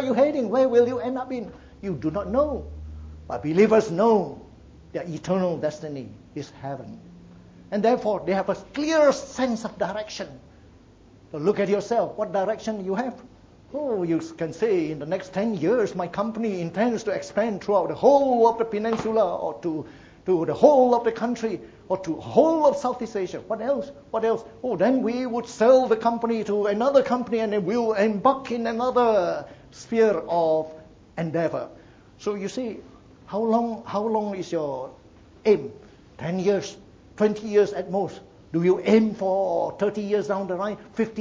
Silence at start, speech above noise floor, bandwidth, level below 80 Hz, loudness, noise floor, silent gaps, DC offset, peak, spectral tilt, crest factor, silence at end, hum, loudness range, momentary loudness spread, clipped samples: 0 s; 28 dB; 7.8 kHz; -54 dBFS; -24 LUFS; -52 dBFS; none; under 0.1%; -2 dBFS; -6.5 dB/octave; 22 dB; 0 s; none; 6 LU; 15 LU; under 0.1%